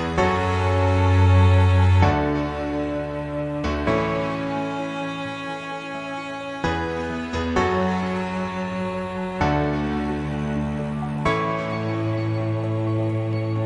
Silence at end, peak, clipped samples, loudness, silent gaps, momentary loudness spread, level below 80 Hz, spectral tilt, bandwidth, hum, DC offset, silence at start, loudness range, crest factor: 0 s; -2 dBFS; under 0.1%; -23 LUFS; none; 11 LU; -40 dBFS; -7.5 dB/octave; 8.8 kHz; none; under 0.1%; 0 s; 7 LU; 20 dB